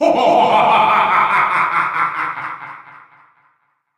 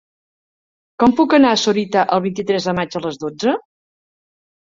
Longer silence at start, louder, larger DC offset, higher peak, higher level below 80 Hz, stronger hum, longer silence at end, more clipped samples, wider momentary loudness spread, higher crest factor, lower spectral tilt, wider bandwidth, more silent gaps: second, 0 s vs 1 s; first, -14 LUFS vs -17 LUFS; neither; about the same, -2 dBFS vs -2 dBFS; second, -64 dBFS vs -56 dBFS; neither; about the same, 1.15 s vs 1.1 s; neither; first, 15 LU vs 11 LU; about the same, 14 dB vs 16 dB; about the same, -4.5 dB/octave vs -5 dB/octave; first, 14.5 kHz vs 7.6 kHz; neither